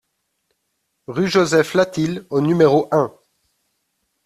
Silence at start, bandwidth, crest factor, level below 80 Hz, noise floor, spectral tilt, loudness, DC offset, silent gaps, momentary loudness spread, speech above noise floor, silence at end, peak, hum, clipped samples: 1.1 s; 14 kHz; 18 dB; -58 dBFS; -72 dBFS; -6 dB/octave; -18 LUFS; under 0.1%; none; 9 LU; 56 dB; 1.15 s; -2 dBFS; none; under 0.1%